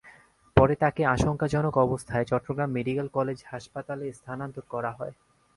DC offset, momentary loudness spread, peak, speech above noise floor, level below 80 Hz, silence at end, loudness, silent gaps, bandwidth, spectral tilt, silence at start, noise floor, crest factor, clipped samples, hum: under 0.1%; 14 LU; -4 dBFS; 28 dB; -46 dBFS; 0.45 s; -27 LUFS; none; 11.5 kHz; -7.5 dB/octave; 0.05 s; -55 dBFS; 24 dB; under 0.1%; none